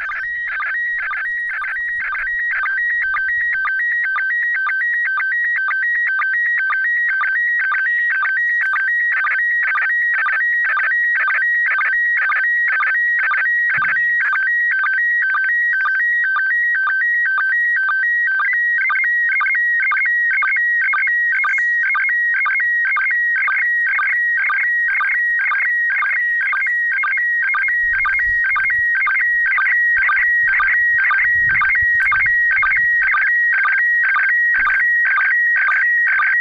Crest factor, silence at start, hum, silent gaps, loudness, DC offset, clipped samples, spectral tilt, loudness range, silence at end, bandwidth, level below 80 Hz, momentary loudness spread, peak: 6 dB; 0 s; none; none; -15 LUFS; under 0.1%; under 0.1%; -1.5 dB/octave; 3 LU; 0 s; 6.6 kHz; -52 dBFS; 4 LU; -10 dBFS